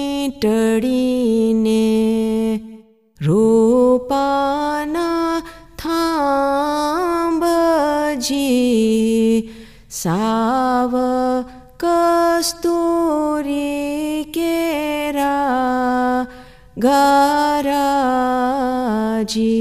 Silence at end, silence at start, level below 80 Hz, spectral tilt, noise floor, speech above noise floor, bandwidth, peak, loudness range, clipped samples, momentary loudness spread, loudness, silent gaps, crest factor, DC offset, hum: 0 s; 0 s; -46 dBFS; -5 dB/octave; -43 dBFS; 28 dB; 15.5 kHz; -2 dBFS; 2 LU; under 0.1%; 7 LU; -17 LUFS; none; 16 dB; 0.3%; none